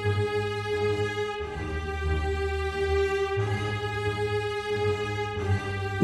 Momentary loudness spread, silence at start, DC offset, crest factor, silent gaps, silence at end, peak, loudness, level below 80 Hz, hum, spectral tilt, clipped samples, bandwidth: 4 LU; 0 s; under 0.1%; 18 dB; none; 0 s; -10 dBFS; -29 LUFS; -38 dBFS; none; -6 dB/octave; under 0.1%; 12.5 kHz